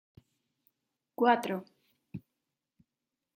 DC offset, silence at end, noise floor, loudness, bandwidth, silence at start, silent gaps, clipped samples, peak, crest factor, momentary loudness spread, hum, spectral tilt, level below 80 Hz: under 0.1%; 1.2 s; -89 dBFS; -30 LUFS; 16 kHz; 1.2 s; none; under 0.1%; -12 dBFS; 24 dB; 22 LU; none; -5.5 dB/octave; -78 dBFS